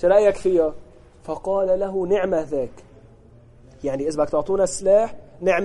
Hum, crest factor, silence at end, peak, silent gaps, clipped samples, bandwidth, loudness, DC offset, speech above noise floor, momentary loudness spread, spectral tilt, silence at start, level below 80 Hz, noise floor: none; 16 dB; 0 s; -4 dBFS; none; under 0.1%; 11.5 kHz; -21 LUFS; under 0.1%; 29 dB; 12 LU; -5.5 dB/octave; 0 s; -46 dBFS; -48 dBFS